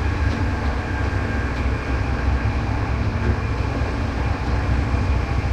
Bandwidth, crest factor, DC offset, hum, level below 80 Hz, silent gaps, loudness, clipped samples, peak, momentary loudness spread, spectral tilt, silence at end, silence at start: 8.8 kHz; 12 dB; under 0.1%; none; -24 dBFS; none; -23 LUFS; under 0.1%; -8 dBFS; 2 LU; -7 dB/octave; 0 s; 0 s